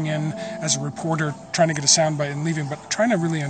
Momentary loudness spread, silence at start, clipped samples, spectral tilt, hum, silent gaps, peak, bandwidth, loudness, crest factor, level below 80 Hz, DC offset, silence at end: 10 LU; 0 s; under 0.1%; -3.5 dB/octave; none; none; -2 dBFS; 9.2 kHz; -22 LUFS; 20 dB; -62 dBFS; under 0.1%; 0 s